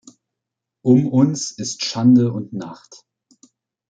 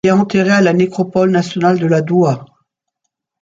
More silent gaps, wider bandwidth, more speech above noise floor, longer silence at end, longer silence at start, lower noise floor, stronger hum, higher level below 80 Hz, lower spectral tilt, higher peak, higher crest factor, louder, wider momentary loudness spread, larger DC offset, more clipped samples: neither; first, 9 kHz vs 7.8 kHz; first, 66 dB vs 62 dB; first, 1.15 s vs 0.95 s; first, 0.85 s vs 0.05 s; first, -83 dBFS vs -75 dBFS; neither; second, -62 dBFS vs -56 dBFS; about the same, -6 dB/octave vs -7 dB/octave; about the same, -2 dBFS vs -2 dBFS; first, 18 dB vs 12 dB; second, -17 LUFS vs -13 LUFS; first, 16 LU vs 4 LU; neither; neither